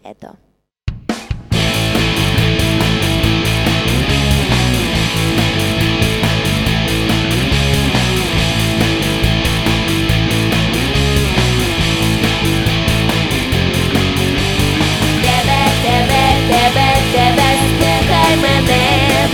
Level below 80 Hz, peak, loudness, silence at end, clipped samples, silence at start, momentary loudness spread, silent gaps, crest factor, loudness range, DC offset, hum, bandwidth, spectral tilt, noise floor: -24 dBFS; 0 dBFS; -13 LUFS; 0 s; under 0.1%; 0.05 s; 3 LU; none; 14 dB; 3 LU; under 0.1%; none; 18.5 kHz; -4.5 dB/octave; -59 dBFS